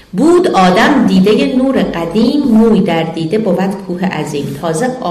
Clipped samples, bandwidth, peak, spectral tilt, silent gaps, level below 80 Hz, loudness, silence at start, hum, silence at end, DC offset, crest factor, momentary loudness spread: under 0.1%; 13.5 kHz; -2 dBFS; -6.5 dB/octave; none; -40 dBFS; -11 LUFS; 0.15 s; none; 0 s; under 0.1%; 10 dB; 9 LU